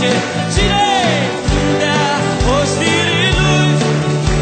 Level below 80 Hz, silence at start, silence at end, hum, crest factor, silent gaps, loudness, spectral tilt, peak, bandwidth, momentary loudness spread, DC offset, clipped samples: -24 dBFS; 0 s; 0 s; none; 14 dB; none; -14 LUFS; -4.5 dB/octave; 0 dBFS; 9.2 kHz; 4 LU; under 0.1%; under 0.1%